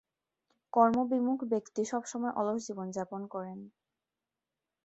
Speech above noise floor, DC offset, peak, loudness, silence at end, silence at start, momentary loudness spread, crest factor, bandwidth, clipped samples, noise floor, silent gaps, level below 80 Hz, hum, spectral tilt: over 58 dB; under 0.1%; -12 dBFS; -32 LUFS; 1.15 s; 0.75 s; 14 LU; 22 dB; 8.2 kHz; under 0.1%; under -90 dBFS; none; -76 dBFS; none; -6 dB/octave